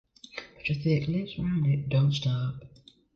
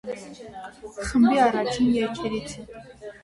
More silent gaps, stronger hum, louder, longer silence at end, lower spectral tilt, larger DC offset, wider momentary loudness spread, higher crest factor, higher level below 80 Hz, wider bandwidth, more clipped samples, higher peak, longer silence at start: neither; neither; second, -28 LUFS vs -23 LUFS; first, 0.5 s vs 0.1 s; first, -7.5 dB/octave vs -5 dB/octave; neither; second, 17 LU vs 21 LU; about the same, 14 dB vs 16 dB; second, -54 dBFS vs -48 dBFS; second, 6.8 kHz vs 11.5 kHz; neither; second, -14 dBFS vs -8 dBFS; first, 0.35 s vs 0.05 s